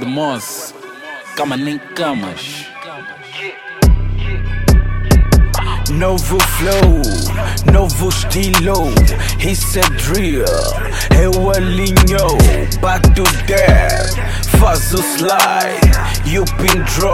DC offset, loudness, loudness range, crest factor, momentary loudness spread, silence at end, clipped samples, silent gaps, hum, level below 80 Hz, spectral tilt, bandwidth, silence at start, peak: under 0.1%; -14 LUFS; 7 LU; 12 dB; 14 LU; 0 s; under 0.1%; none; none; -16 dBFS; -4.5 dB/octave; 17 kHz; 0 s; 0 dBFS